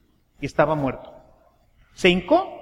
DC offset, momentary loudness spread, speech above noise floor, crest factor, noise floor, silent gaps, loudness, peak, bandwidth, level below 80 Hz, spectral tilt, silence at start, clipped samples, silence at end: under 0.1%; 13 LU; 37 dB; 20 dB; -58 dBFS; none; -21 LUFS; -4 dBFS; 12 kHz; -48 dBFS; -6 dB/octave; 0.4 s; under 0.1%; 0 s